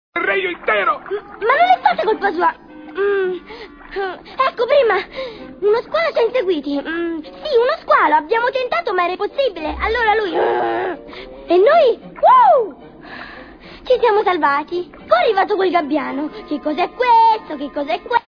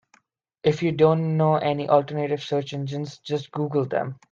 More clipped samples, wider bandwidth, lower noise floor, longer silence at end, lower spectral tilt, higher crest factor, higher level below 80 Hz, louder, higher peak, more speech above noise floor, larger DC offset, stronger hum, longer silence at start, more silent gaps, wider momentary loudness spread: neither; second, 5.4 kHz vs 7.4 kHz; second, -38 dBFS vs -64 dBFS; about the same, 0.1 s vs 0.15 s; second, -6 dB/octave vs -7.5 dB/octave; about the same, 16 dB vs 18 dB; first, -46 dBFS vs -64 dBFS; first, -17 LUFS vs -24 LUFS; first, 0 dBFS vs -6 dBFS; second, 21 dB vs 41 dB; neither; neither; second, 0.15 s vs 0.65 s; neither; first, 16 LU vs 10 LU